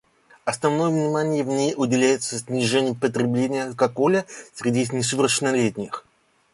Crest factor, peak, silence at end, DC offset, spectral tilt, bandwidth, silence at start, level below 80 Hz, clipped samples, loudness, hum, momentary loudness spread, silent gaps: 18 dB; -4 dBFS; 0.55 s; under 0.1%; -4.5 dB/octave; 11.5 kHz; 0.45 s; -62 dBFS; under 0.1%; -22 LUFS; none; 8 LU; none